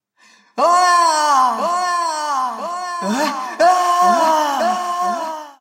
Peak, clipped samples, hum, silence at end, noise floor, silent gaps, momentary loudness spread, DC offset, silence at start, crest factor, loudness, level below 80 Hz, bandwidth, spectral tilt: -2 dBFS; under 0.1%; none; 0.1 s; -52 dBFS; none; 10 LU; under 0.1%; 0.55 s; 14 dB; -16 LUFS; -72 dBFS; 16 kHz; -2 dB/octave